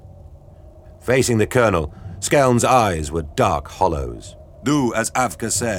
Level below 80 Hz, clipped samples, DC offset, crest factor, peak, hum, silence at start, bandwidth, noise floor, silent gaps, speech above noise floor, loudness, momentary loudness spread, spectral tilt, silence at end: -38 dBFS; under 0.1%; under 0.1%; 18 dB; -2 dBFS; none; 0.05 s; 19.5 kHz; -43 dBFS; none; 25 dB; -19 LUFS; 12 LU; -4.5 dB/octave; 0 s